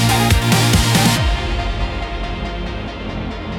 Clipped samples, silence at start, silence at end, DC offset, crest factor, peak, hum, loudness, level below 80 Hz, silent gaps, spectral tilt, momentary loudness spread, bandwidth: under 0.1%; 0 s; 0 s; under 0.1%; 14 dB; -2 dBFS; none; -17 LUFS; -24 dBFS; none; -4.5 dB/octave; 13 LU; 18 kHz